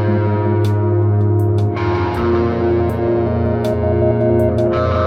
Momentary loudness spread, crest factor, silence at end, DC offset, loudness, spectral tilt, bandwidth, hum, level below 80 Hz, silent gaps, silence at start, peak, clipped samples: 3 LU; 12 dB; 0 s; under 0.1%; -16 LUFS; -9.5 dB/octave; 6.2 kHz; none; -34 dBFS; none; 0 s; -4 dBFS; under 0.1%